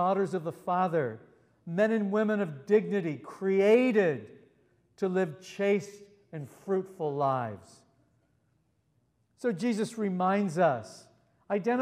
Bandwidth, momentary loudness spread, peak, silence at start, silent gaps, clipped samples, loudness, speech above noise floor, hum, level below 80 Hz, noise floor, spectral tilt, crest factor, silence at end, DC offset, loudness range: 12.5 kHz; 14 LU; -12 dBFS; 0 s; none; under 0.1%; -29 LUFS; 44 dB; none; -80 dBFS; -72 dBFS; -7 dB/octave; 18 dB; 0 s; under 0.1%; 7 LU